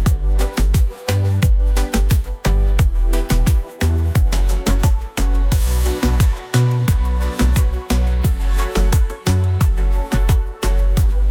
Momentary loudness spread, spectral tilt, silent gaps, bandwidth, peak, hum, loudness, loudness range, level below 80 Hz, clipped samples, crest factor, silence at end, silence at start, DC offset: 3 LU; -6 dB/octave; none; 17 kHz; -2 dBFS; none; -18 LUFS; 1 LU; -16 dBFS; under 0.1%; 12 dB; 0 s; 0 s; under 0.1%